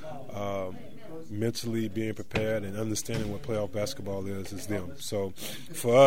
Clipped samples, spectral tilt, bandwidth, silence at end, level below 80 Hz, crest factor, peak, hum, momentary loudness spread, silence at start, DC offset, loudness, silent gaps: under 0.1%; -5 dB/octave; 16 kHz; 0 s; -52 dBFS; 22 dB; -6 dBFS; none; 9 LU; 0 s; 1%; -33 LUFS; none